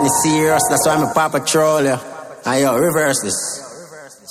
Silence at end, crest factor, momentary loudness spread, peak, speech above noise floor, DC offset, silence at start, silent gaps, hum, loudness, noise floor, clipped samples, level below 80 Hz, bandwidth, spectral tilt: 0 s; 14 dB; 16 LU; -2 dBFS; 22 dB; under 0.1%; 0 s; none; none; -16 LUFS; -38 dBFS; under 0.1%; -52 dBFS; 16 kHz; -3.5 dB/octave